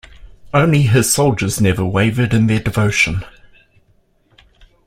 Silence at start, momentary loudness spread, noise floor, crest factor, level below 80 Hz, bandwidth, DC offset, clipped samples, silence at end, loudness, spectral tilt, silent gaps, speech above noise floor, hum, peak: 0.25 s; 4 LU; -57 dBFS; 16 dB; -40 dBFS; 16.5 kHz; under 0.1%; under 0.1%; 1.55 s; -15 LUFS; -5 dB/octave; none; 43 dB; none; 0 dBFS